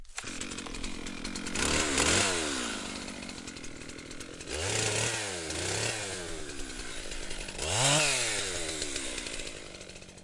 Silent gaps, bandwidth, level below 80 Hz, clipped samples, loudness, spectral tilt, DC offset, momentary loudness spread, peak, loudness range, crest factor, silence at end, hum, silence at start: none; 11.5 kHz; -48 dBFS; under 0.1%; -31 LUFS; -2 dB/octave; under 0.1%; 18 LU; -12 dBFS; 3 LU; 22 dB; 0 s; none; 0 s